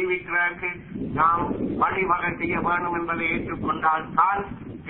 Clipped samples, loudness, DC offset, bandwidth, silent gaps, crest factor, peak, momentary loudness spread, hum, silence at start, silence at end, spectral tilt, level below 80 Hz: under 0.1%; -24 LUFS; under 0.1%; 4.2 kHz; none; 18 dB; -6 dBFS; 8 LU; none; 0 s; 0 s; -10.5 dB/octave; -48 dBFS